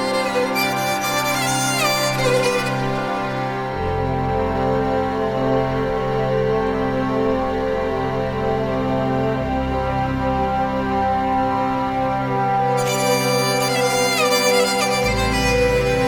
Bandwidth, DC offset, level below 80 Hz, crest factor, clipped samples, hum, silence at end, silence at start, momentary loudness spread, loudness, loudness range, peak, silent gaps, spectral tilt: over 20 kHz; under 0.1%; -36 dBFS; 14 dB; under 0.1%; none; 0 s; 0 s; 5 LU; -19 LUFS; 4 LU; -4 dBFS; none; -4.5 dB/octave